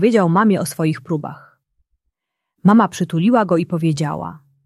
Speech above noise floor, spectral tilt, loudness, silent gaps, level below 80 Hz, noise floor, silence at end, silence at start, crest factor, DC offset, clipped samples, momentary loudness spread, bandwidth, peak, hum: 63 dB; -7 dB/octave; -17 LUFS; none; -60 dBFS; -79 dBFS; 0.3 s; 0 s; 16 dB; under 0.1%; under 0.1%; 11 LU; 13 kHz; -2 dBFS; none